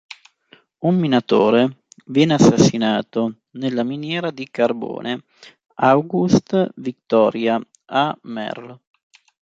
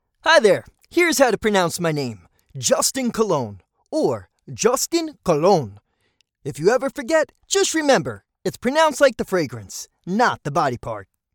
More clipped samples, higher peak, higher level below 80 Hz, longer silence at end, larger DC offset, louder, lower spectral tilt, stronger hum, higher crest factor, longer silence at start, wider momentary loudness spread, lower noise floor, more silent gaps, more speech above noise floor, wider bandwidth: neither; about the same, -2 dBFS vs -2 dBFS; about the same, -56 dBFS vs -54 dBFS; first, 0.8 s vs 0.3 s; neither; about the same, -19 LUFS vs -20 LUFS; first, -6 dB/octave vs -3.5 dB/octave; neither; about the same, 18 dB vs 20 dB; first, 0.8 s vs 0.25 s; second, 13 LU vs 16 LU; second, -54 dBFS vs -67 dBFS; neither; second, 36 dB vs 47 dB; second, 8 kHz vs 19 kHz